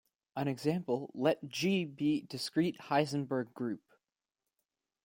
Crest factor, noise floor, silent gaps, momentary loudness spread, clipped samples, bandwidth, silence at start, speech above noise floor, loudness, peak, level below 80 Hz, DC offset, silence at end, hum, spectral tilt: 20 dB; under -90 dBFS; none; 7 LU; under 0.1%; 16.5 kHz; 0.35 s; over 56 dB; -34 LUFS; -16 dBFS; -76 dBFS; under 0.1%; 1.25 s; none; -6 dB/octave